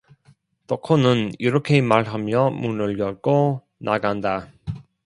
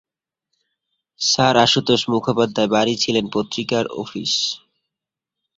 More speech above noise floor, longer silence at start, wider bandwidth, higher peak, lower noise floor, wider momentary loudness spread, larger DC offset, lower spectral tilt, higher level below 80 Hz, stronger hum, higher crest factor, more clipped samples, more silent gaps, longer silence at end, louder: second, 38 dB vs 67 dB; second, 0.7 s vs 1.2 s; first, 11 kHz vs 8 kHz; about the same, 0 dBFS vs -2 dBFS; second, -58 dBFS vs -86 dBFS; first, 12 LU vs 9 LU; neither; first, -7.5 dB/octave vs -3.5 dB/octave; about the same, -54 dBFS vs -58 dBFS; neither; about the same, 20 dB vs 20 dB; neither; neither; second, 0.25 s vs 1 s; second, -21 LUFS vs -18 LUFS